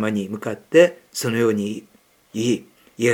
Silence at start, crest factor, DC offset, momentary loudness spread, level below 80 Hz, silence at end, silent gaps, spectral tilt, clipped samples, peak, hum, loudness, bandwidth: 0 s; 18 dB; under 0.1%; 14 LU; -72 dBFS; 0 s; none; -5 dB/octave; under 0.1%; -2 dBFS; none; -21 LUFS; 18 kHz